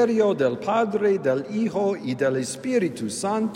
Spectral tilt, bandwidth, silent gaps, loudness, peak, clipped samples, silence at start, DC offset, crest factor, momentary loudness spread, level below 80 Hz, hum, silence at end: -5.5 dB/octave; 16 kHz; none; -24 LUFS; -8 dBFS; under 0.1%; 0 s; under 0.1%; 14 dB; 5 LU; -70 dBFS; none; 0 s